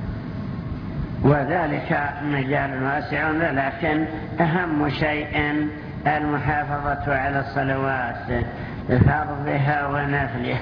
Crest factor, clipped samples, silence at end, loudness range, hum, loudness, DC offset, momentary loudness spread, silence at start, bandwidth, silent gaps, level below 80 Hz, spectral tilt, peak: 18 dB; under 0.1%; 0 s; 1 LU; none; -23 LUFS; under 0.1%; 10 LU; 0 s; 5.4 kHz; none; -38 dBFS; -9.5 dB/octave; -4 dBFS